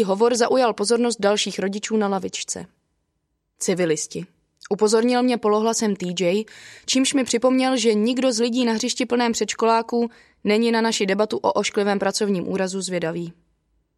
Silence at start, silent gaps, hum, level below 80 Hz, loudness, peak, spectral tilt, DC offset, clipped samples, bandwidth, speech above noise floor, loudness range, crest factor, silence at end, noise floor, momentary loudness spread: 0 s; none; none; -66 dBFS; -21 LUFS; -4 dBFS; -4 dB/octave; under 0.1%; under 0.1%; 13 kHz; 53 dB; 4 LU; 16 dB; 0.65 s; -74 dBFS; 9 LU